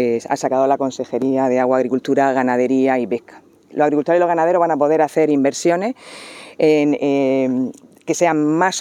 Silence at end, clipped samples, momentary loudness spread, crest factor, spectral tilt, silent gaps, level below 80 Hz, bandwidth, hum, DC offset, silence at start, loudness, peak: 0 s; under 0.1%; 10 LU; 16 dB; -5.5 dB/octave; none; -74 dBFS; 13 kHz; none; under 0.1%; 0 s; -17 LUFS; -2 dBFS